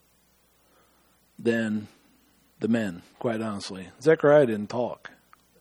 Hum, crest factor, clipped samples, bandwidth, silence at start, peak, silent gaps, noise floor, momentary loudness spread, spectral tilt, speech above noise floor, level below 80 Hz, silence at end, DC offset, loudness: none; 22 dB; under 0.1%; 14.5 kHz; 1.4 s; -6 dBFS; none; -64 dBFS; 16 LU; -6.5 dB/octave; 39 dB; -70 dBFS; 0.65 s; under 0.1%; -26 LUFS